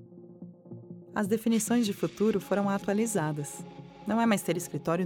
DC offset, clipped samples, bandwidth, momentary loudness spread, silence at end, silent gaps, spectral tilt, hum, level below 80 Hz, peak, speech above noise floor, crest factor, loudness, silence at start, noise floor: under 0.1%; under 0.1%; 18.5 kHz; 20 LU; 0 s; none; -5.5 dB/octave; none; -66 dBFS; -14 dBFS; 20 dB; 16 dB; -29 LUFS; 0 s; -48 dBFS